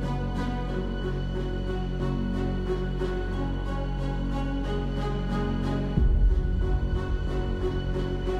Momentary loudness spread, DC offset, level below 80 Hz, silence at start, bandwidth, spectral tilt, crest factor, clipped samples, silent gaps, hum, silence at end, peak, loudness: 5 LU; under 0.1%; -28 dBFS; 0 s; 7.2 kHz; -8 dB/octave; 16 dB; under 0.1%; none; none; 0 s; -10 dBFS; -29 LUFS